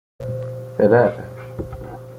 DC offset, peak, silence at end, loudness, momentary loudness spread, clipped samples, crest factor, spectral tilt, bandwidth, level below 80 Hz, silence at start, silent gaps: under 0.1%; -2 dBFS; 0 s; -19 LUFS; 18 LU; under 0.1%; 18 dB; -9 dB/octave; 15 kHz; -46 dBFS; 0.2 s; none